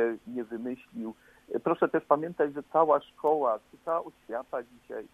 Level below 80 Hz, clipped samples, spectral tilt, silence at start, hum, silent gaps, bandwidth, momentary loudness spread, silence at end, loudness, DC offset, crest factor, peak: -72 dBFS; under 0.1%; -8 dB/octave; 0 s; none; none; 13.5 kHz; 13 LU; 0.05 s; -30 LUFS; under 0.1%; 22 dB; -8 dBFS